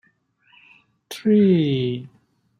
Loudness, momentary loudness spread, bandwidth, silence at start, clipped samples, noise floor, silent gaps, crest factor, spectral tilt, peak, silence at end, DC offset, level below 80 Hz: -19 LUFS; 16 LU; 14 kHz; 1.1 s; under 0.1%; -62 dBFS; none; 16 dB; -8 dB/octave; -8 dBFS; 0.55 s; under 0.1%; -64 dBFS